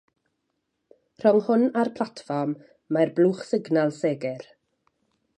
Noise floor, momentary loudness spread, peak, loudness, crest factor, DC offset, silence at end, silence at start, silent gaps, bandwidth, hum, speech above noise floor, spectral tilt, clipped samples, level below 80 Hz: -77 dBFS; 11 LU; -6 dBFS; -24 LUFS; 20 dB; under 0.1%; 0.95 s; 1.2 s; none; 9.4 kHz; none; 54 dB; -7.5 dB/octave; under 0.1%; -76 dBFS